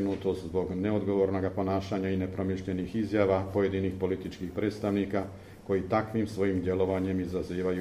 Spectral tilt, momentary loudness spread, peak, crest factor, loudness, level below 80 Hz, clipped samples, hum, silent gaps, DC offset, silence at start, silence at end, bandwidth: -8 dB/octave; 5 LU; -12 dBFS; 18 dB; -30 LUFS; -54 dBFS; under 0.1%; none; none; under 0.1%; 0 s; 0 s; 14 kHz